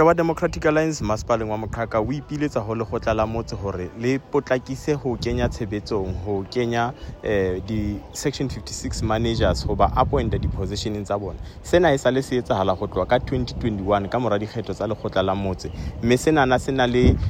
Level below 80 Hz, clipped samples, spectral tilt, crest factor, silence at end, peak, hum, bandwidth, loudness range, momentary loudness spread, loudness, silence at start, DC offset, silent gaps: -34 dBFS; under 0.1%; -6 dB/octave; 18 dB; 0 s; -4 dBFS; none; 16 kHz; 3 LU; 9 LU; -23 LUFS; 0 s; under 0.1%; none